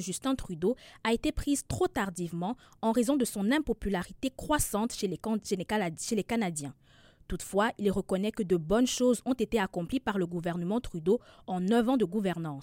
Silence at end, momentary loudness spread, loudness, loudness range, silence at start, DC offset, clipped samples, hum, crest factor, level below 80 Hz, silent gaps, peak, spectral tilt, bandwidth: 0 s; 7 LU; -31 LUFS; 3 LU; 0 s; under 0.1%; under 0.1%; none; 16 dB; -48 dBFS; none; -14 dBFS; -5 dB/octave; 16.5 kHz